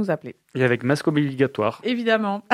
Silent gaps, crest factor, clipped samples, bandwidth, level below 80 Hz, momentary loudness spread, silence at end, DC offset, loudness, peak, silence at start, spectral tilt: none; 20 dB; under 0.1%; 14 kHz; -66 dBFS; 5 LU; 0 s; under 0.1%; -22 LUFS; -2 dBFS; 0 s; -6.5 dB/octave